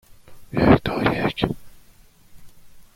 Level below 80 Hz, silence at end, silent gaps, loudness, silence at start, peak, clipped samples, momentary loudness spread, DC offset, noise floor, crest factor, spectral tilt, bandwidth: -40 dBFS; 0.15 s; none; -21 LUFS; 0.1 s; -2 dBFS; under 0.1%; 12 LU; under 0.1%; -51 dBFS; 22 dB; -7.5 dB/octave; 16.5 kHz